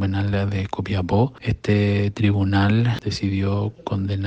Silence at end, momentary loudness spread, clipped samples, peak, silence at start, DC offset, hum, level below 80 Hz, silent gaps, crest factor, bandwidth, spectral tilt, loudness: 0 s; 7 LU; under 0.1%; -6 dBFS; 0 s; under 0.1%; none; -44 dBFS; none; 16 dB; 7.8 kHz; -7.5 dB/octave; -22 LUFS